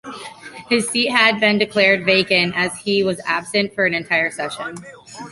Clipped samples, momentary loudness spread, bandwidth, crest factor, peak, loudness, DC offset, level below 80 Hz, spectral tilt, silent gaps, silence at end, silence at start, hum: under 0.1%; 20 LU; 11.5 kHz; 18 dB; -2 dBFS; -17 LUFS; under 0.1%; -60 dBFS; -3.5 dB/octave; none; 0 s; 0.05 s; none